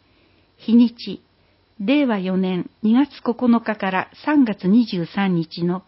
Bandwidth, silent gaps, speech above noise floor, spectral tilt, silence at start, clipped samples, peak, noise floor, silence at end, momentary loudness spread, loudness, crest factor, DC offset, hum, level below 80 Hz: 5.8 kHz; none; 40 dB; -11.5 dB/octave; 0.65 s; under 0.1%; -4 dBFS; -59 dBFS; 0.05 s; 8 LU; -20 LUFS; 14 dB; under 0.1%; none; -62 dBFS